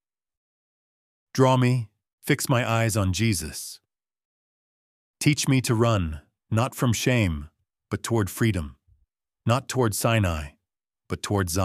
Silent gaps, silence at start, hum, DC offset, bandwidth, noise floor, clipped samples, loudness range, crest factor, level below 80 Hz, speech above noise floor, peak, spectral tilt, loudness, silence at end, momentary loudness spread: 2.13-2.18 s, 4.25-5.14 s; 1.35 s; none; under 0.1%; 15.5 kHz; -86 dBFS; under 0.1%; 2 LU; 20 dB; -46 dBFS; 63 dB; -4 dBFS; -5 dB/octave; -24 LUFS; 0 s; 14 LU